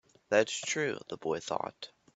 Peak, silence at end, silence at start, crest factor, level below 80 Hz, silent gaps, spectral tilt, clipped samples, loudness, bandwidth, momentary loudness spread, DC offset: -10 dBFS; 0.3 s; 0.3 s; 24 dB; -74 dBFS; none; -3 dB/octave; under 0.1%; -33 LUFS; 8.4 kHz; 10 LU; under 0.1%